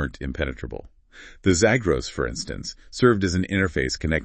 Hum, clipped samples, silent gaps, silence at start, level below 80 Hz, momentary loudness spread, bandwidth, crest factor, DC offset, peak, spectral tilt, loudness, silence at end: none; under 0.1%; none; 0 s; -38 dBFS; 15 LU; 8.8 kHz; 20 dB; under 0.1%; -4 dBFS; -5 dB/octave; -23 LUFS; 0 s